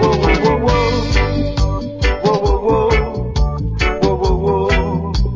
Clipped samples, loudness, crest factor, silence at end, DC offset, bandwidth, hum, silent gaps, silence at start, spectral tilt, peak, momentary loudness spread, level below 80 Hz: under 0.1%; -16 LUFS; 14 dB; 0 s; under 0.1%; 7.6 kHz; none; none; 0 s; -6.5 dB/octave; 0 dBFS; 5 LU; -20 dBFS